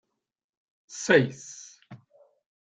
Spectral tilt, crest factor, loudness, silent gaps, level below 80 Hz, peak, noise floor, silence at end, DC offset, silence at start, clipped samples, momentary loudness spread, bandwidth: -4.5 dB/octave; 24 dB; -24 LUFS; none; -68 dBFS; -6 dBFS; -61 dBFS; 0.65 s; under 0.1%; 0.9 s; under 0.1%; 23 LU; 9.4 kHz